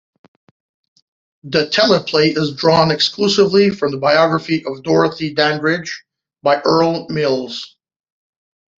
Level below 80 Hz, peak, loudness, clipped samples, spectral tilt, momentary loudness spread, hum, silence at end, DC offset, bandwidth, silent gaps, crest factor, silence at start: -56 dBFS; -2 dBFS; -15 LUFS; under 0.1%; -5 dB/octave; 9 LU; none; 1.1 s; under 0.1%; 7.8 kHz; none; 16 dB; 1.45 s